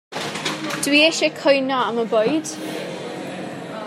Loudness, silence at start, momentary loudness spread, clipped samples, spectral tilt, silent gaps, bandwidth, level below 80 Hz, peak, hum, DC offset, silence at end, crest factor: -20 LUFS; 0.1 s; 15 LU; under 0.1%; -3 dB/octave; none; 16 kHz; -72 dBFS; -2 dBFS; none; under 0.1%; 0 s; 18 dB